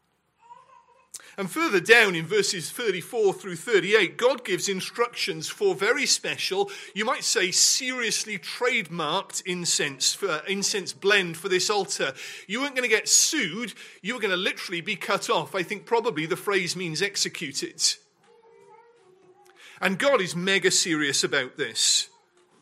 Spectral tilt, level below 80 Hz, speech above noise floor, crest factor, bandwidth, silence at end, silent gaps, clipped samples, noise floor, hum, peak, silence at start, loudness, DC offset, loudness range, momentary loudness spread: -1.5 dB/octave; -76 dBFS; 36 dB; 22 dB; 16 kHz; 0.55 s; none; under 0.1%; -61 dBFS; none; -4 dBFS; 0.5 s; -24 LUFS; under 0.1%; 4 LU; 11 LU